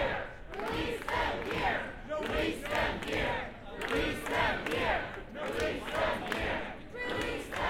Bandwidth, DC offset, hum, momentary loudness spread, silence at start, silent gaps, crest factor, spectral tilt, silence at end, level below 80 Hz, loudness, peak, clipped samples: 17 kHz; under 0.1%; none; 8 LU; 0 s; none; 18 dB; -4.5 dB/octave; 0 s; -46 dBFS; -34 LUFS; -16 dBFS; under 0.1%